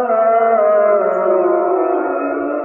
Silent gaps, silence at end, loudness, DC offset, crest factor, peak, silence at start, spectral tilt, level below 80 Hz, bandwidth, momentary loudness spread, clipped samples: none; 0 s; -14 LUFS; under 0.1%; 12 dB; -2 dBFS; 0 s; -9.5 dB/octave; -68 dBFS; 3.1 kHz; 6 LU; under 0.1%